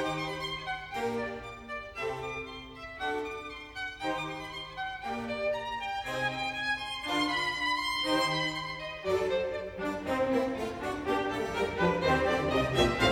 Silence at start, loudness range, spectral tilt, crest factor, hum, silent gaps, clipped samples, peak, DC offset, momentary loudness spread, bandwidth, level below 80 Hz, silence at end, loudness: 0 s; 7 LU; -4.5 dB/octave; 20 dB; none; none; under 0.1%; -12 dBFS; under 0.1%; 11 LU; 17 kHz; -52 dBFS; 0 s; -32 LUFS